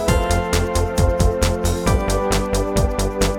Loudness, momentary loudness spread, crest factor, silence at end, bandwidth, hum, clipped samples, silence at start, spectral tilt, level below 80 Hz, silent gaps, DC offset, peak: -19 LUFS; 2 LU; 16 dB; 0 s; 18 kHz; none; under 0.1%; 0 s; -5 dB/octave; -22 dBFS; none; under 0.1%; -2 dBFS